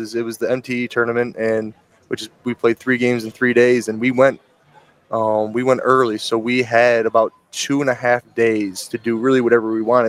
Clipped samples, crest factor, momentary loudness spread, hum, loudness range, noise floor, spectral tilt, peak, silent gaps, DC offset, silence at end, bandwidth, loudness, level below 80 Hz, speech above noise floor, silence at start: under 0.1%; 18 dB; 10 LU; none; 2 LU; -52 dBFS; -5 dB/octave; 0 dBFS; none; under 0.1%; 0 s; 16 kHz; -18 LUFS; -66 dBFS; 34 dB; 0 s